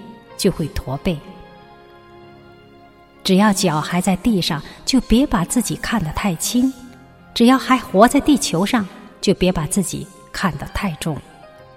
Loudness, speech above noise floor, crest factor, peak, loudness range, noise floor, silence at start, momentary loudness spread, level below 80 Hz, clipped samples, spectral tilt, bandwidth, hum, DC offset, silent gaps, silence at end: -18 LUFS; 29 dB; 20 dB; 0 dBFS; 5 LU; -46 dBFS; 0 s; 12 LU; -36 dBFS; under 0.1%; -4.5 dB/octave; 16.5 kHz; none; under 0.1%; none; 0.3 s